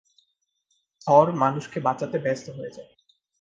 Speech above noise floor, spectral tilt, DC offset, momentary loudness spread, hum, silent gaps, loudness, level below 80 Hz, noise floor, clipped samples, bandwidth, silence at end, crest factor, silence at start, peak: 51 dB; -7 dB/octave; under 0.1%; 19 LU; none; none; -23 LUFS; -70 dBFS; -74 dBFS; under 0.1%; 7.8 kHz; 0.55 s; 22 dB; 1.05 s; -4 dBFS